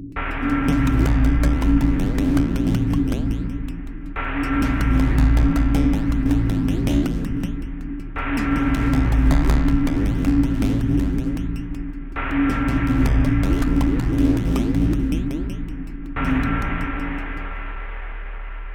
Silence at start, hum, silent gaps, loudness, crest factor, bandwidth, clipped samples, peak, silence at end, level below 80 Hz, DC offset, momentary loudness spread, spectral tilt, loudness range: 0 s; none; none; -21 LUFS; 16 dB; 16 kHz; under 0.1%; -4 dBFS; 0 s; -22 dBFS; under 0.1%; 13 LU; -7.5 dB/octave; 3 LU